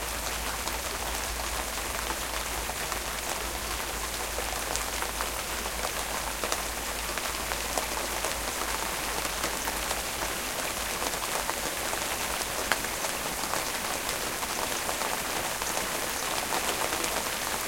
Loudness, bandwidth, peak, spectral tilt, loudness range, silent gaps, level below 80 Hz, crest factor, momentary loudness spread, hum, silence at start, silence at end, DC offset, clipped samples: -30 LUFS; 17 kHz; -4 dBFS; -1.5 dB/octave; 2 LU; none; -44 dBFS; 28 dB; 3 LU; none; 0 s; 0 s; under 0.1%; under 0.1%